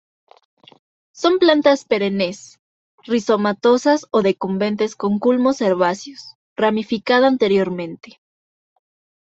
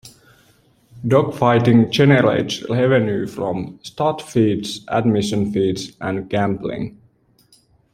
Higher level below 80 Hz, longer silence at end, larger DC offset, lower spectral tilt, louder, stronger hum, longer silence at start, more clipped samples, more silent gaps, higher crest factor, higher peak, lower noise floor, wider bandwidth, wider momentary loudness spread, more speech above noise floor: second, -64 dBFS vs -52 dBFS; first, 1.3 s vs 1.05 s; neither; about the same, -5.5 dB/octave vs -6.5 dB/octave; about the same, -18 LUFS vs -18 LUFS; neither; first, 1.15 s vs 0.05 s; neither; first, 2.59-2.98 s, 6.35-6.56 s vs none; about the same, 18 dB vs 18 dB; about the same, -2 dBFS vs -2 dBFS; first, under -90 dBFS vs -56 dBFS; second, 8 kHz vs 15 kHz; about the same, 14 LU vs 12 LU; first, over 73 dB vs 39 dB